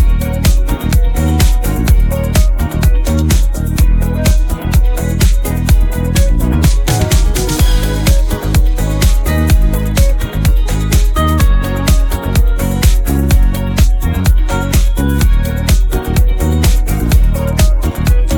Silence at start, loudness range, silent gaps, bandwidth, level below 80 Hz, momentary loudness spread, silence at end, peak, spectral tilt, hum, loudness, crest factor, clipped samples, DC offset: 0 s; 1 LU; none; 18.5 kHz; -12 dBFS; 2 LU; 0 s; 0 dBFS; -5.5 dB/octave; none; -13 LUFS; 10 dB; under 0.1%; under 0.1%